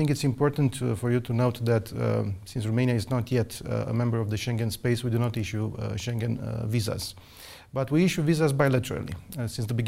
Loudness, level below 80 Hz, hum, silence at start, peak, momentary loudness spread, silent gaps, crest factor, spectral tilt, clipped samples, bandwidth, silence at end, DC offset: -27 LUFS; -50 dBFS; none; 0 s; -8 dBFS; 10 LU; none; 18 dB; -6.5 dB/octave; under 0.1%; 16 kHz; 0 s; under 0.1%